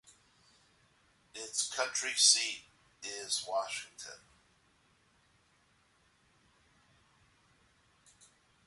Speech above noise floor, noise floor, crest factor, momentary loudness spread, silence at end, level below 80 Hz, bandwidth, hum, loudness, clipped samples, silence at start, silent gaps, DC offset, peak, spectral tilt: 37 dB; -70 dBFS; 28 dB; 24 LU; 4.5 s; -80 dBFS; 12 kHz; none; -31 LUFS; under 0.1%; 1.35 s; none; under 0.1%; -10 dBFS; 2.5 dB/octave